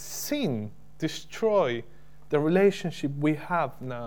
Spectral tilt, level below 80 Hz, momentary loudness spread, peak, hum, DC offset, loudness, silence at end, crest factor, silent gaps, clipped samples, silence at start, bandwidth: -5.5 dB/octave; -60 dBFS; 11 LU; -10 dBFS; none; 0.8%; -27 LUFS; 0 s; 18 dB; none; under 0.1%; 0 s; 18 kHz